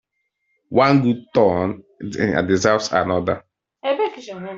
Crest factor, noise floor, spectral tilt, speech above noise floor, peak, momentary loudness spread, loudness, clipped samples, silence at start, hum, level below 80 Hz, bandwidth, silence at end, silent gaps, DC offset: 18 dB; -72 dBFS; -6 dB/octave; 54 dB; -2 dBFS; 13 LU; -19 LUFS; under 0.1%; 0.7 s; none; -56 dBFS; 7.8 kHz; 0 s; none; under 0.1%